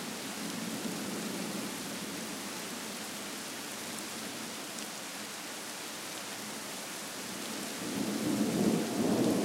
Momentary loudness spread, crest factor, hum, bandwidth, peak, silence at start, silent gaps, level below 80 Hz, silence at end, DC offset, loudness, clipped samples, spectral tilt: 9 LU; 20 dB; none; 16 kHz; -16 dBFS; 0 s; none; -72 dBFS; 0 s; under 0.1%; -36 LUFS; under 0.1%; -3.5 dB/octave